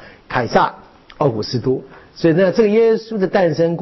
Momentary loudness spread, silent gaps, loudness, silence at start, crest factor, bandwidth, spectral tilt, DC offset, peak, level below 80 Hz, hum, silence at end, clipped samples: 8 LU; none; -17 LUFS; 0 s; 14 dB; 6.2 kHz; -5.5 dB/octave; under 0.1%; -4 dBFS; -48 dBFS; none; 0 s; under 0.1%